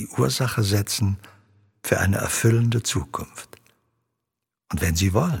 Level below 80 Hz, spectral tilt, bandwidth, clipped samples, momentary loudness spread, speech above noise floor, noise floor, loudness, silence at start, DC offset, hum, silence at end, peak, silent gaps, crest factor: -44 dBFS; -5 dB/octave; 17.5 kHz; under 0.1%; 13 LU; 62 dB; -84 dBFS; -23 LUFS; 0 s; under 0.1%; none; 0 s; -4 dBFS; none; 20 dB